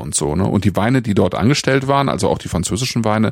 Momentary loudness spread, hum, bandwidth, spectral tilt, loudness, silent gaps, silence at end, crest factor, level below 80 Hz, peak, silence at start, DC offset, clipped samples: 4 LU; none; 16.5 kHz; -5 dB/octave; -17 LUFS; none; 0 s; 14 dB; -38 dBFS; -2 dBFS; 0 s; under 0.1%; under 0.1%